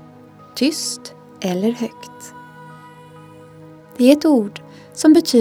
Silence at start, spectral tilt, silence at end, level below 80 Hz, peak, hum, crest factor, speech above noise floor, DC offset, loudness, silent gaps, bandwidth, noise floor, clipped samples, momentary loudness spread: 0.55 s; -4.5 dB/octave; 0 s; -64 dBFS; 0 dBFS; none; 18 dB; 27 dB; under 0.1%; -17 LUFS; none; 17 kHz; -43 dBFS; under 0.1%; 25 LU